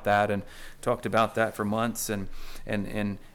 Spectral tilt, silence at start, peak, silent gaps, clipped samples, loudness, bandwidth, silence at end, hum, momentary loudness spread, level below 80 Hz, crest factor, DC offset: -5 dB/octave; 0 s; -12 dBFS; none; under 0.1%; -29 LUFS; 18 kHz; 0.05 s; none; 11 LU; -44 dBFS; 16 dB; under 0.1%